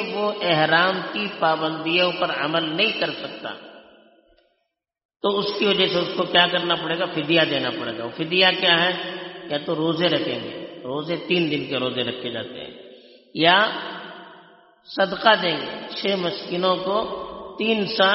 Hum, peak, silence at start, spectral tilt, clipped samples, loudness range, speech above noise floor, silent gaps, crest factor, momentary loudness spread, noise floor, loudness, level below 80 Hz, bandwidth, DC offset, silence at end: none; -2 dBFS; 0 s; -1.5 dB/octave; under 0.1%; 5 LU; 54 dB; 5.05-5.09 s; 22 dB; 16 LU; -76 dBFS; -21 LUFS; -64 dBFS; 6 kHz; under 0.1%; 0 s